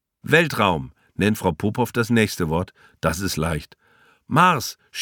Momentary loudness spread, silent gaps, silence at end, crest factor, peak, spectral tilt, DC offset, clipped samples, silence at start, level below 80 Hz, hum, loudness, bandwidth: 11 LU; none; 0 s; 20 dB; -2 dBFS; -5 dB/octave; under 0.1%; under 0.1%; 0.25 s; -44 dBFS; none; -21 LUFS; 19 kHz